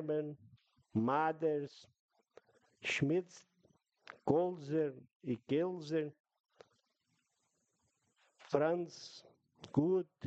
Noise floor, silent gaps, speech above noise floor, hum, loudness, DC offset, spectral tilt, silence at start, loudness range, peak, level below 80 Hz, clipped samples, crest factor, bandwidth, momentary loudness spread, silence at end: -82 dBFS; 2.00-2.09 s, 5.15-5.20 s, 6.20-6.24 s, 6.40-6.44 s; 46 dB; none; -37 LUFS; under 0.1%; -6.5 dB/octave; 0 s; 5 LU; -16 dBFS; -78 dBFS; under 0.1%; 22 dB; 8.6 kHz; 16 LU; 0 s